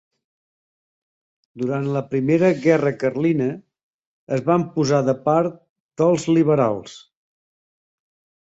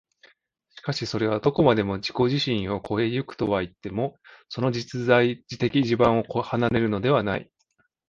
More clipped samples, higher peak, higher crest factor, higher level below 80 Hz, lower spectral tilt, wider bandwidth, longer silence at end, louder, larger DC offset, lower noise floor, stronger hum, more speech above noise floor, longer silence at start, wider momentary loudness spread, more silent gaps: neither; about the same, -4 dBFS vs -4 dBFS; about the same, 18 dB vs 20 dB; second, -62 dBFS vs -52 dBFS; about the same, -7 dB/octave vs -6.5 dB/octave; about the same, 8.2 kHz vs 7.6 kHz; first, 1.5 s vs 0.65 s; first, -20 LUFS vs -24 LUFS; neither; first, under -90 dBFS vs -70 dBFS; neither; first, over 71 dB vs 46 dB; first, 1.55 s vs 0.85 s; about the same, 10 LU vs 9 LU; first, 3.83-4.27 s, 5.69-5.89 s vs none